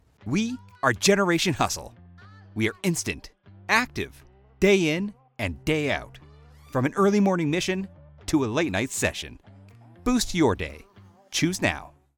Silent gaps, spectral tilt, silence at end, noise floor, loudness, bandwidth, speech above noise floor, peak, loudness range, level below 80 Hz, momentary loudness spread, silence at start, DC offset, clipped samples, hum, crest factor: none; -4.5 dB/octave; 0.3 s; -50 dBFS; -25 LUFS; 19 kHz; 25 dB; -6 dBFS; 2 LU; -48 dBFS; 15 LU; 0.25 s; under 0.1%; under 0.1%; none; 20 dB